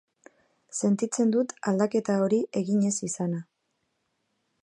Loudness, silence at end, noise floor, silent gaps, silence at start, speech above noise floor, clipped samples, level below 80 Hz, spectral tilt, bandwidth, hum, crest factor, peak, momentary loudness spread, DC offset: -27 LUFS; 1.2 s; -77 dBFS; none; 0.75 s; 51 dB; under 0.1%; -74 dBFS; -6 dB/octave; 11 kHz; none; 18 dB; -10 dBFS; 6 LU; under 0.1%